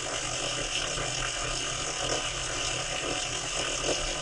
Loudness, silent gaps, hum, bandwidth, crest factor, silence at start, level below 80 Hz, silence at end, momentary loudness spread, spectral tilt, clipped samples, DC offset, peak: -29 LUFS; none; none; 11.5 kHz; 16 dB; 0 s; -44 dBFS; 0 s; 1 LU; -1.5 dB/octave; under 0.1%; under 0.1%; -14 dBFS